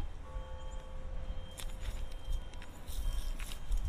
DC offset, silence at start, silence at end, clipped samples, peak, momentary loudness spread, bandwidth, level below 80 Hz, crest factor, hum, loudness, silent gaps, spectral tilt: under 0.1%; 0 s; 0 s; under 0.1%; -22 dBFS; 6 LU; 15.5 kHz; -38 dBFS; 16 dB; none; -45 LUFS; none; -4.5 dB/octave